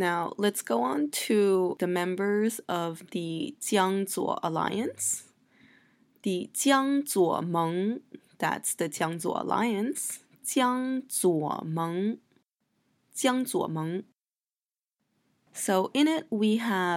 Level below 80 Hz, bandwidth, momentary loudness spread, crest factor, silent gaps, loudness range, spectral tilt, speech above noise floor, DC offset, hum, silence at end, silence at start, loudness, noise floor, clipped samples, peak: -80 dBFS; 16.5 kHz; 9 LU; 18 dB; none; 4 LU; -4 dB/octave; over 62 dB; under 0.1%; none; 0 s; 0 s; -28 LUFS; under -90 dBFS; under 0.1%; -10 dBFS